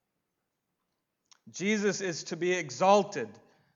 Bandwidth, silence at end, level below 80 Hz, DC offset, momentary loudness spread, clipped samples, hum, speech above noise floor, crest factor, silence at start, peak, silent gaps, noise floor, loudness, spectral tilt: 7.8 kHz; 0.4 s; -84 dBFS; under 0.1%; 14 LU; under 0.1%; none; 54 dB; 22 dB; 1.45 s; -10 dBFS; none; -83 dBFS; -29 LUFS; -4 dB/octave